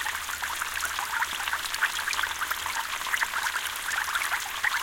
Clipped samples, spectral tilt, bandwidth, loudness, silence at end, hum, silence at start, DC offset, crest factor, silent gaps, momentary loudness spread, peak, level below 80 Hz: under 0.1%; 1.5 dB/octave; 17 kHz; -28 LUFS; 0 s; none; 0 s; under 0.1%; 20 dB; none; 3 LU; -10 dBFS; -58 dBFS